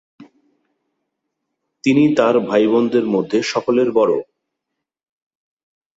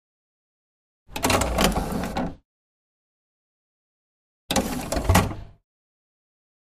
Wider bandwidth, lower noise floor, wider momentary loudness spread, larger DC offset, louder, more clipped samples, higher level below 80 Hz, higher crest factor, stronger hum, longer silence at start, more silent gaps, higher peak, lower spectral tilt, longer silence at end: second, 8 kHz vs 15.5 kHz; second, -80 dBFS vs under -90 dBFS; second, 5 LU vs 11 LU; neither; first, -16 LUFS vs -24 LUFS; neither; second, -62 dBFS vs -36 dBFS; second, 18 dB vs 26 dB; neither; second, 0.2 s vs 1.1 s; second, none vs 2.45-4.49 s; about the same, -2 dBFS vs -2 dBFS; first, -6 dB/octave vs -4 dB/octave; first, 1.75 s vs 1.15 s